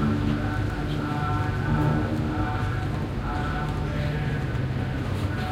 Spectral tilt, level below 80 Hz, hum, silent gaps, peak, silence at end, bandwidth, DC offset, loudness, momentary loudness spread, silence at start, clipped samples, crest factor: -7.5 dB/octave; -34 dBFS; none; none; -12 dBFS; 0 s; 14 kHz; under 0.1%; -27 LUFS; 4 LU; 0 s; under 0.1%; 14 dB